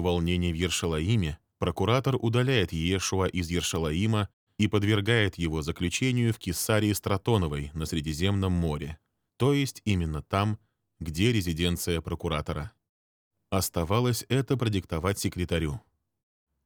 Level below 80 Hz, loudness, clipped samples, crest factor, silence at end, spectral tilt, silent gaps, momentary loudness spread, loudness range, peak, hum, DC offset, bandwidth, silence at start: -44 dBFS; -28 LUFS; under 0.1%; 20 dB; 0.85 s; -5 dB/octave; 4.33-4.47 s, 12.89-13.31 s; 7 LU; 3 LU; -8 dBFS; none; under 0.1%; over 20 kHz; 0 s